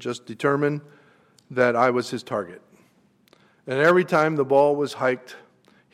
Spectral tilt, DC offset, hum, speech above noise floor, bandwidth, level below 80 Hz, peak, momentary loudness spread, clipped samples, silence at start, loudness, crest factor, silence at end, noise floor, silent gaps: -6 dB/octave; under 0.1%; none; 39 dB; 14.5 kHz; -72 dBFS; -6 dBFS; 13 LU; under 0.1%; 0 s; -22 LUFS; 18 dB; 0.55 s; -61 dBFS; none